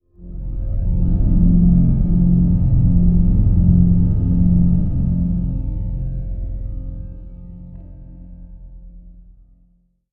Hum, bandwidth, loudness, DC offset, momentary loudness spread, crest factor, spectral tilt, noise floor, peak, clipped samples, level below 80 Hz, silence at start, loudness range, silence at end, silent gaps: none; 1.3 kHz; -17 LUFS; under 0.1%; 22 LU; 14 dB; -15 dB/octave; -58 dBFS; -2 dBFS; under 0.1%; -20 dBFS; 0.2 s; 18 LU; 1 s; none